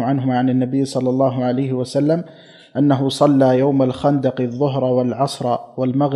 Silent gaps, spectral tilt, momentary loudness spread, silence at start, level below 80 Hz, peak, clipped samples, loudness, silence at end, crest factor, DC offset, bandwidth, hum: none; -7.5 dB/octave; 7 LU; 0 s; -58 dBFS; -2 dBFS; under 0.1%; -18 LUFS; 0 s; 16 dB; under 0.1%; 12 kHz; none